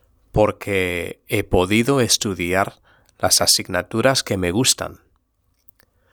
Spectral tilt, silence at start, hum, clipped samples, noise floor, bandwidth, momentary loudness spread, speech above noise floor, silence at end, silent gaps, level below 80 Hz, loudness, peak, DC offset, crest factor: -3 dB/octave; 0.35 s; none; under 0.1%; -66 dBFS; over 20 kHz; 9 LU; 47 dB; 1.2 s; none; -42 dBFS; -19 LUFS; 0 dBFS; under 0.1%; 20 dB